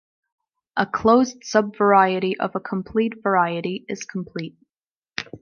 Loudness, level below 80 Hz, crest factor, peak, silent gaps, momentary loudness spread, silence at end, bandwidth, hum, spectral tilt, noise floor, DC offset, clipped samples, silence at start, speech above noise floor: -21 LUFS; -58 dBFS; 20 dB; -2 dBFS; 4.70-4.74 s, 4.91-5.02 s; 15 LU; 0.05 s; 7.2 kHz; none; -5.5 dB/octave; under -90 dBFS; under 0.1%; under 0.1%; 0.75 s; over 69 dB